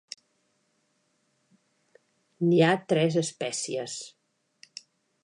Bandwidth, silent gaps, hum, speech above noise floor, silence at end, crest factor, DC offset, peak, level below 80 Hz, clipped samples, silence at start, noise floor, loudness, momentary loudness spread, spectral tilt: 11 kHz; none; none; 47 dB; 1.15 s; 20 dB; under 0.1%; -10 dBFS; -80 dBFS; under 0.1%; 2.4 s; -73 dBFS; -26 LUFS; 24 LU; -5 dB/octave